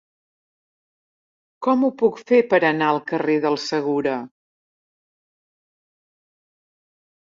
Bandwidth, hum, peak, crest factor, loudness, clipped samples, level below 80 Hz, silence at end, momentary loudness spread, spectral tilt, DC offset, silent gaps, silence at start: 7.6 kHz; none; -4 dBFS; 20 dB; -20 LUFS; under 0.1%; -72 dBFS; 2.95 s; 7 LU; -5.5 dB/octave; under 0.1%; none; 1.6 s